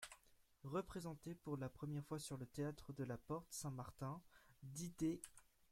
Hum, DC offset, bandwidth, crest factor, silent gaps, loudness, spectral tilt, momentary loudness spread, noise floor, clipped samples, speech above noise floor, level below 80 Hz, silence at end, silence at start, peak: none; under 0.1%; 16.5 kHz; 20 dB; none; -50 LUFS; -6 dB/octave; 12 LU; -73 dBFS; under 0.1%; 24 dB; -72 dBFS; 0.3 s; 0 s; -30 dBFS